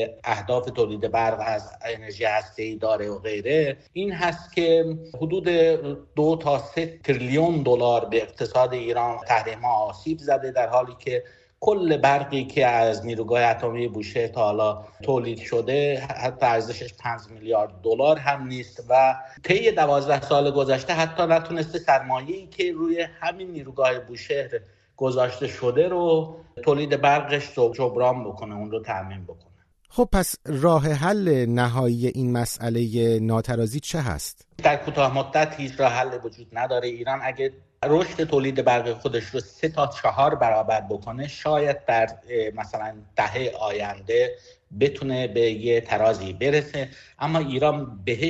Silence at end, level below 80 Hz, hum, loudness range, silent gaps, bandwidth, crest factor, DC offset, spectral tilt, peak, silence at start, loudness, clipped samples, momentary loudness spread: 0 s; -48 dBFS; none; 4 LU; none; 13.5 kHz; 20 dB; under 0.1%; -6 dB/octave; -4 dBFS; 0 s; -23 LUFS; under 0.1%; 10 LU